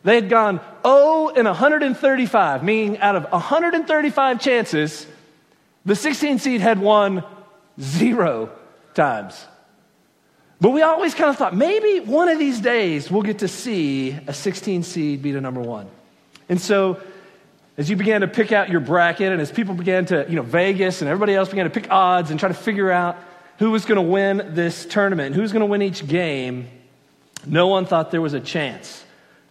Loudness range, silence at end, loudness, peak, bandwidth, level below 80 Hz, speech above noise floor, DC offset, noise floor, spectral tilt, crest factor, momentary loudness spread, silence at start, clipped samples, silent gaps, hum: 6 LU; 0.5 s; -19 LUFS; -2 dBFS; 14.5 kHz; -68 dBFS; 41 dB; under 0.1%; -59 dBFS; -5.5 dB/octave; 18 dB; 10 LU; 0.05 s; under 0.1%; none; none